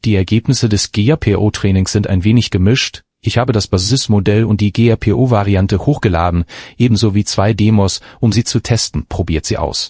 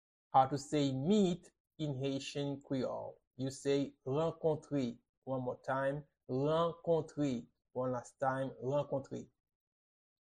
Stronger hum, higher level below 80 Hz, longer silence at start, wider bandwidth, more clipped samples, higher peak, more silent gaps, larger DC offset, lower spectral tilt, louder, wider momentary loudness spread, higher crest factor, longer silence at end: neither; first, -28 dBFS vs -70 dBFS; second, 0.05 s vs 0.35 s; second, 8 kHz vs 11 kHz; neither; first, 0 dBFS vs -16 dBFS; second, none vs 1.60-1.65 s, 3.27-3.31 s, 5.09-5.22 s; neither; about the same, -5.5 dB/octave vs -6.5 dB/octave; first, -14 LUFS vs -37 LUFS; second, 5 LU vs 12 LU; second, 14 dB vs 22 dB; second, 0 s vs 1.15 s